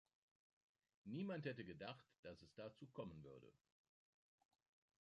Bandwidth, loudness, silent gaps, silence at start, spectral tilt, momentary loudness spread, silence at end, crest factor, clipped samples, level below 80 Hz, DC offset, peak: 9 kHz; -54 LUFS; 2.19-2.23 s; 1.05 s; -7.5 dB/octave; 13 LU; 1.5 s; 22 dB; under 0.1%; -82 dBFS; under 0.1%; -34 dBFS